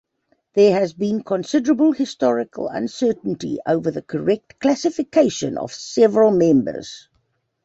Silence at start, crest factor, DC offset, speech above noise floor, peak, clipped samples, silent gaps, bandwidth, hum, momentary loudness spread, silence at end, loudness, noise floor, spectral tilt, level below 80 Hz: 0.55 s; 16 dB; under 0.1%; 49 dB; -2 dBFS; under 0.1%; none; 8 kHz; none; 11 LU; 0.65 s; -19 LUFS; -68 dBFS; -6 dB/octave; -60 dBFS